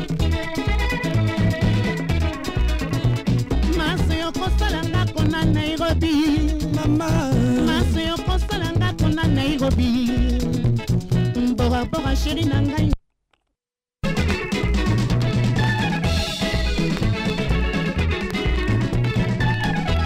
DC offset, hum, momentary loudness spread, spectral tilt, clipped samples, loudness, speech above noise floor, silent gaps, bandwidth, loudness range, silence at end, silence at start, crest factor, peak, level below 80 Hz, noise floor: under 0.1%; none; 4 LU; -6.5 dB/octave; under 0.1%; -21 LUFS; 68 dB; none; 16 kHz; 2 LU; 0 s; 0 s; 14 dB; -6 dBFS; -28 dBFS; -86 dBFS